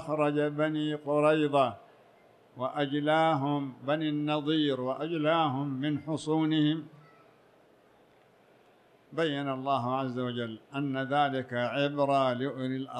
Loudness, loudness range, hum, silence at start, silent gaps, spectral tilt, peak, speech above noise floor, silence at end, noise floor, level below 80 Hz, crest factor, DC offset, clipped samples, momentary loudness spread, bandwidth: -30 LUFS; 6 LU; none; 0 s; none; -7 dB/octave; -12 dBFS; 33 dB; 0 s; -62 dBFS; -76 dBFS; 18 dB; under 0.1%; under 0.1%; 9 LU; 9.6 kHz